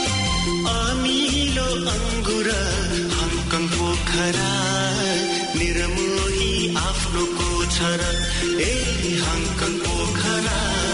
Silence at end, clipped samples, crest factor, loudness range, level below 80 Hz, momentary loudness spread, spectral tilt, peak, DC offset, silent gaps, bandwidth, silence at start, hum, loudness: 0 s; under 0.1%; 12 dB; 1 LU; -30 dBFS; 2 LU; -3.5 dB/octave; -10 dBFS; under 0.1%; none; 11 kHz; 0 s; none; -21 LUFS